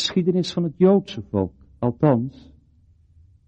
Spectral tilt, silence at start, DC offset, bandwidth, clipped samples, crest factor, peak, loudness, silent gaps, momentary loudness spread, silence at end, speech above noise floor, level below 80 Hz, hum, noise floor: -7 dB/octave; 0 s; under 0.1%; 8.4 kHz; under 0.1%; 18 dB; -4 dBFS; -21 LUFS; none; 10 LU; 1.2 s; 35 dB; -54 dBFS; none; -56 dBFS